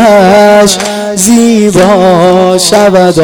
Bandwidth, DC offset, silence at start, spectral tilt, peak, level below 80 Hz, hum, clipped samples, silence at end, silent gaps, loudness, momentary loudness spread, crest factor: over 20 kHz; 0.5%; 0 s; -4.5 dB/octave; 0 dBFS; -36 dBFS; none; 5%; 0 s; none; -5 LUFS; 5 LU; 4 dB